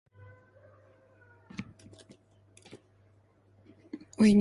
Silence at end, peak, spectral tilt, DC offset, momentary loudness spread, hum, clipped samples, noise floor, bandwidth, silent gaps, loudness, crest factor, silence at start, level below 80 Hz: 0 s; -12 dBFS; -7 dB/octave; under 0.1%; 30 LU; none; under 0.1%; -64 dBFS; 11.5 kHz; none; -30 LUFS; 22 dB; 1.6 s; -64 dBFS